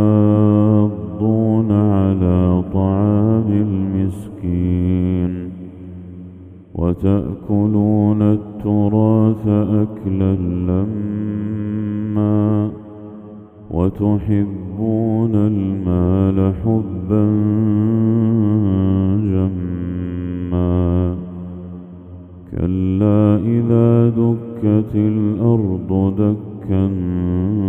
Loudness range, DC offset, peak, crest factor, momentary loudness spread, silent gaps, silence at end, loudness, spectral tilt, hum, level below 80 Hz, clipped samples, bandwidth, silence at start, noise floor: 5 LU; under 0.1%; 0 dBFS; 16 dB; 13 LU; none; 0 s; -17 LUFS; -11.5 dB/octave; none; -40 dBFS; under 0.1%; 3.5 kHz; 0 s; -37 dBFS